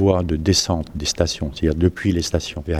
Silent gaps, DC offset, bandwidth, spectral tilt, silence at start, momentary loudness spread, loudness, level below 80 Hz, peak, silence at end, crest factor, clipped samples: none; under 0.1%; 14 kHz; -5 dB/octave; 0 s; 6 LU; -20 LUFS; -34 dBFS; -2 dBFS; 0 s; 18 dB; under 0.1%